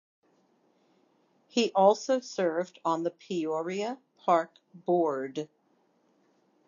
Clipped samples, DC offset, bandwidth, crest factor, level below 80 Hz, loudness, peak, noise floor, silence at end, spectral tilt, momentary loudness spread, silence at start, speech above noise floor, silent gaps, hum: under 0.1%; under 0.1%; 7.4 kHz; 22 dB; under -90 dBFS; -29 LUFS; -8 dBFS; -70 dBFS; 1.25 s; -5 dB/octave; 14 LU; 1.55 s; 41 dB; none; none